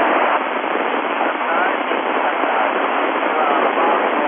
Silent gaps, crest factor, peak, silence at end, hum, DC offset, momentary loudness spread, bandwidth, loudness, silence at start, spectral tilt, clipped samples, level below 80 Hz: none; 14 dB; -2 dBFS; 0 s; none; under 0.1%; 3 LU; 3.8 kHz; -18 LUFS; 0 s; 0 dB/octave; under 0.1%; -74 dBFS